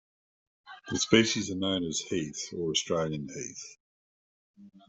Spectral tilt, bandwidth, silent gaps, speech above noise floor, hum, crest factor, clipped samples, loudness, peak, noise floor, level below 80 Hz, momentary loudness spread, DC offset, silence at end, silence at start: -3.5 dB/octave; 8.2 kHz; 3.80-4.54 s; over 60 dB; none; 26 dB; under 0.1%; -29 LUFS; -6 dBFS; under -90 dBFS; -64 dBFS; 16 LU; under 0.1%; 0.1 s; 0.65 s